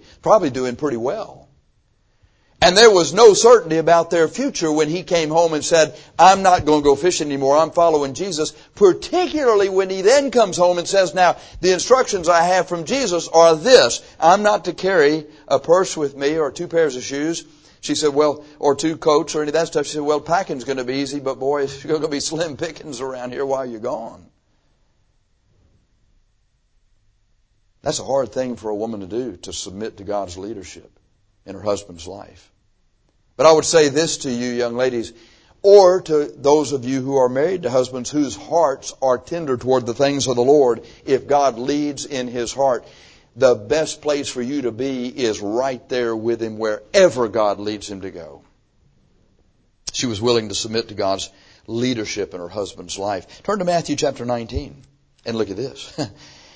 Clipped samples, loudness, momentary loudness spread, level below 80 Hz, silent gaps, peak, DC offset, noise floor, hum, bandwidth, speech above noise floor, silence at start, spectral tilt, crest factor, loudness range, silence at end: under 0.1%; -18 LUFS; 15 LU; -50 dBFS; none; 0 dBFS; under 0.1%; -62 dBFS; none; 8 kHz; 44 dB; 0.25 s; -4 dB/octave; 18 dB; 12 LU; 0.45 s